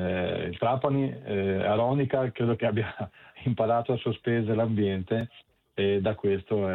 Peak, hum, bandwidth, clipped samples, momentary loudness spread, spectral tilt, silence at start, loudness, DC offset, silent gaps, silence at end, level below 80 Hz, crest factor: -10 dBFS; none; 4.2 kHz; under 0.1%; 6 LU; -10 dB/octave; 0 s; -28 LUFS; under 0.1%; none; 0 s; -60 dBFS; 18 dB